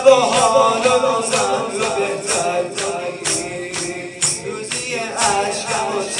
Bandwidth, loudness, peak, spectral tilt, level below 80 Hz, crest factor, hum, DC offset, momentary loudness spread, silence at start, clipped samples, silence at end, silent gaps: 11.5 kHz; -18 LUFS; 0 dBFS; -2 dB/octave; -56 dBFS; 18 dB; none; under 0.1%; 10 LU; 0 s; under 0.1%; 0 s; none